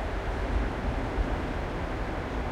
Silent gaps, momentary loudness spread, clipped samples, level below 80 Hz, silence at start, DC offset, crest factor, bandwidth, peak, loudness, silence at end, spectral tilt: none; 2 LU; under 0.1%; -32 dBFS; 0 s; under 0.1%; 14 dB; 10.5 kHz; -16 dBFS; -32 LUFS; 0 s; -7 dB/octave